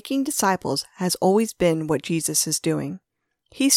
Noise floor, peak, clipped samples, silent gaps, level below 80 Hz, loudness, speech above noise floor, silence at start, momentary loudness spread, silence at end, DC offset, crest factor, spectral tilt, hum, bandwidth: -61 dBFS; -4 dBFS; under 0.1%; none; -56 dBFS; -22 LUFS; 38 dB; 0.05 s; 7 LU; 0 s; under 0.1%; 18 dB; -3.5 dB/octave; none; 17.5 kHz